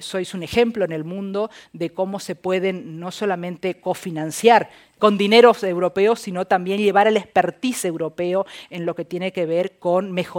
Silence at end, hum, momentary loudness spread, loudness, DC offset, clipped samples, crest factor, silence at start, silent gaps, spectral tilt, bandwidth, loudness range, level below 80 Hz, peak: 0 s; none; 12 LU; -20 LUFS; under 0.1%; under 0.1%; 20 dB; 0 s; none; -5 dB/octave; 17 kHz; 8 LU; -60 dBFS; 0 dBFS